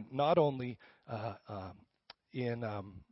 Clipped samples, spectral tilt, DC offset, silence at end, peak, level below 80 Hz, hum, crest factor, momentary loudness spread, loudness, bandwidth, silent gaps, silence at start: under 0.1%; -6 dB/octave; under 0.1%; 0.1 s; -18 dBFS; -70 dBFS; none; 20 dB; 17 LU; -36 LUFS; 5.8 kHz; none; 0 s